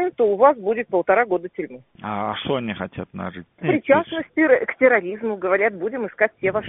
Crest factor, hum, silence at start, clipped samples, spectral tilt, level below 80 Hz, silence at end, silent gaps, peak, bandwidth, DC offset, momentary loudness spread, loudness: 18 dB; none; 0 s; under 0.1%; -4 dB/octave; -60 dBFS; 0 s; none; -2 dBFS; 3.9 kHz; under 0.1%; 15 LU; -20 LUFS